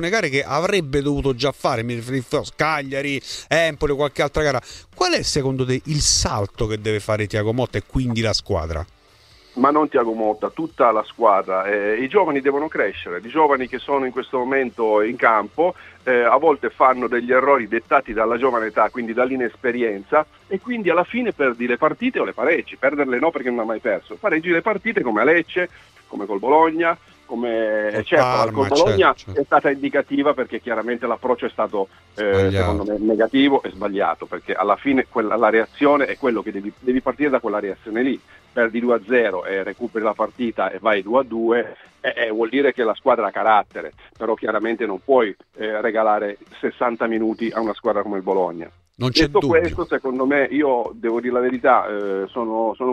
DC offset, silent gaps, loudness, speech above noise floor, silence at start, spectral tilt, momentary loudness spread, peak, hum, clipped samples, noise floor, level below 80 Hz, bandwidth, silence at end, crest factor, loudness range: under 0.1%; none; -20 LUFS; 32 dB; 0 s; -5 dB/octave; 9 LU; 0 dBFS; none; under 0.1%; -51 dBFS; -44 dBFS; 13.5 kHz; 0 s; 20 dB; 3 LU